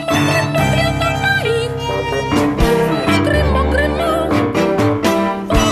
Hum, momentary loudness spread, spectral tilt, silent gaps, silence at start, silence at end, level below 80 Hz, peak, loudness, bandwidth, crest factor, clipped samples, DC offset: none; 3 LU; -5.5 dB/octave; none; 0 s; 0 s; -26 dBFS; -2 dBFS; -15 LUFS; 14 kHz; 14 dB; under 0.1%; under 0.1%